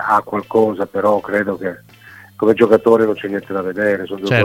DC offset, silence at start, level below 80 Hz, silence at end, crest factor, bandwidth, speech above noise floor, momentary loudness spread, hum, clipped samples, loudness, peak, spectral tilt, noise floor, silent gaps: under 0.1%; 0 s; -56 dBFS; 0 s; 16 dB; 16 kHz; 26 dB; 11 LU; none; under 0.1%; -17 LUFS; 0 dBFS; -7 dB/octave; -42 dBFS; none